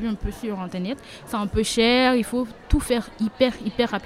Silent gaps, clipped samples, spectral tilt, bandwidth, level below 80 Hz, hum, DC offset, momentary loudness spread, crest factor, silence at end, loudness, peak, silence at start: none; under 0.1%; -4.5 dB/octave; 15.5 kHz; -34 dBFS; none; under 0.1%; 12 LU; 18 dB; 0 s; -23 LUFS; -4 dBFS; 0 s